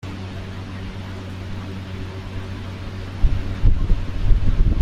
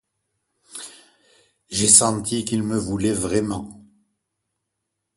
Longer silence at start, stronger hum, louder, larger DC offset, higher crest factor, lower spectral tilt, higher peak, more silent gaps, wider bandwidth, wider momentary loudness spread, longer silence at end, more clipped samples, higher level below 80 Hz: second, 0.05 s vs 0.75 s; neither; second, -27 LUFS vs -19 LUFS; neither; second, 18 dB vs 24 dB; first, -7.5 dB/octave vs -3 dB/octave; about the same, -2 dBFS vs 0 dBFS; neither; second, 6.8 kHz vs 12 kHz; second, 10 LU vs 25 LU; second, 0 s vs 1.35 s; neither; first, -22 dBFS vs -50 dBFS